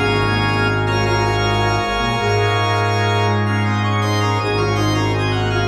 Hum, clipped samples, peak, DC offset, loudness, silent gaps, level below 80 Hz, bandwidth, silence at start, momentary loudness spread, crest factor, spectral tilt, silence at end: none; under 0.1%; -4 dBFS; under 0.1%; -17 LUFS; none; -34 dBFS; 12.5 kHz; 0 s; 1 LU; 12 dB; -5.5 dB/octave; 0 s